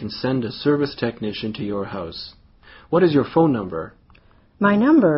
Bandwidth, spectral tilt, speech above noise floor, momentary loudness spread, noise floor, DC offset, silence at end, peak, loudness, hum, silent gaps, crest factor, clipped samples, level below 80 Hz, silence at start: 5.8 kHz; -5.5 dB/octave; 33 dB; 14 LU; -52 dBFS; under 0.1%; 0 s; -4 dBFS; -21 LUFS; none; none; 16 dB; under 0.1%; -52 dBFS; 0 s